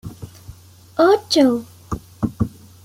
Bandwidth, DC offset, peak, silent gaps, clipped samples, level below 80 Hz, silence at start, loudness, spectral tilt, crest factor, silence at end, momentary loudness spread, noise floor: 16 kHz; under 0.1%; -4 dBFS; none; under 0.1%; -44 dBFS; 0.05 s; -19 LUFS; -5.5 dB/octave; 18 dB; 0.35 s; 21 LU; -42 dBFS